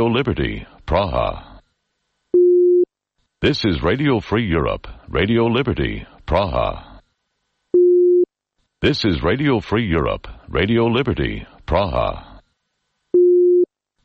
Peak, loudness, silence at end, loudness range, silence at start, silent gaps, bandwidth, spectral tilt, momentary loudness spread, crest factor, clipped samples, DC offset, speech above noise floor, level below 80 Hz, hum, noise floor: -4 dBFS; -18 LUFS; 0.4 s; 3 LU; 0 s; none; 6.4 kHz; -7.5 dB/octave; 11 LU; 16 dB; under 0.1%; under 0.1%; 54 dB; -34 dBFS; none; -73 dBFS